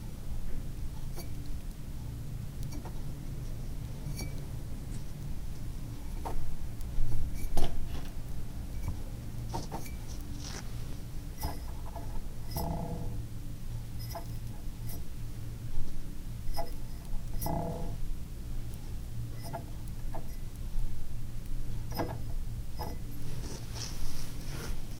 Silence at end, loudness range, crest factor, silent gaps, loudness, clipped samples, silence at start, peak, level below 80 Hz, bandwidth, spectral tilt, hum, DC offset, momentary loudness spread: 0 s; 2 LU; 20 dB; none; -41 LUFS; under 0.1%; 0 s; -10 dBFS; -36 dBFS; 16 kHz; -5.5 dB/octave; none; under 0.1%; 6 LU